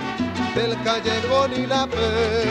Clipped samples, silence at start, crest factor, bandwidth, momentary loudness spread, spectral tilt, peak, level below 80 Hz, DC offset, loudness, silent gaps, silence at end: under 0.1%; 0 s; 14 dB; 10.5 kHz; 3 LU; -5 dB/octave; -6 dBFS; -42 dBFS; under 0.1%; -22 LUFS; none; 0 s